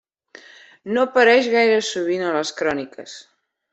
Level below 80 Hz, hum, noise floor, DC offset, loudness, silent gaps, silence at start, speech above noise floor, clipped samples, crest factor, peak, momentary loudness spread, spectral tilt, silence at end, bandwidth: -66 dBFS; none; -47 dBFS; under 0.1%; -18 LUFS; none; 0.85 s; 28 dB; under 0.1%; 18 dB; -2 dBFS; 23 LU; -3.5 dB/octave; 0.5 s; 8.2 kHz